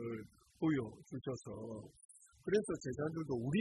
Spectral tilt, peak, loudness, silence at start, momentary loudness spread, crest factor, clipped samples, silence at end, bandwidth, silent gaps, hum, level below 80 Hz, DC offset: -6.5 dB/octave; -22 dBFS; -41 LUFS; 0 s; 20 LU; 18 dB; under 0.1%; 0 s; 12 kHz; 2.05-2.09 s; none; -68 dBFS; under 0.1%